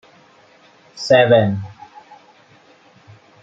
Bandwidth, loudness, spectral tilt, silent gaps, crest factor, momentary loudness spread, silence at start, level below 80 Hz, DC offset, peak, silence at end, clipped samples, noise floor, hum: 8 kHz; -15 LUFS; -6 dB/octave; none; 18 dB; 18 LU; 0.95 s; -62 dBFS; under 0.1%; -2 dBFS; 1.7 s; under 0.1%; -50 dBFS; none